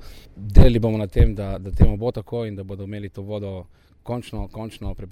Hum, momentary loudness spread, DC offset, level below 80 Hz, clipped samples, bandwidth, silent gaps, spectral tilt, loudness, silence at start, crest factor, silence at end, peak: none; 17 LU; under 0.1%; -22 dBFS; under 0.1%; 9.4 kHz; none; -8.5 dB/octave; -23 LUFS; 0 s; 20 dB; 0.05 s; 0 dBFS